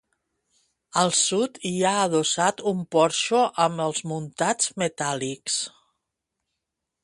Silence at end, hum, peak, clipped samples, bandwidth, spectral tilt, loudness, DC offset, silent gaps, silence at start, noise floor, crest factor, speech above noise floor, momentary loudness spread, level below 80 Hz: 1.35 s; none; -6 dBFS; under 0.1%; 11.5 kHz; -3 dB/octave; -23 LUFS; under 0.1%; none; 0.95 s; -83 dBFS; 20 dB; 59 dB; 7 LU; -68 dBFS